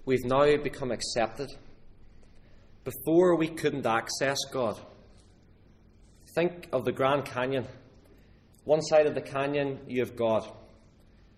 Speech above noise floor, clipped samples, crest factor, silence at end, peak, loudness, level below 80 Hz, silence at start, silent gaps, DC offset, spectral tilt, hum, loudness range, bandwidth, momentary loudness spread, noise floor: 30 dB; under 0.1%; 20 dB; 0.75 s; -10 dBFS; -28 LUFS; -54 dBFS; 0 s; none; under 0.1%; -5 dB/octave; none; 3 LU; 15 kHz; 14 LU; -57 dBFS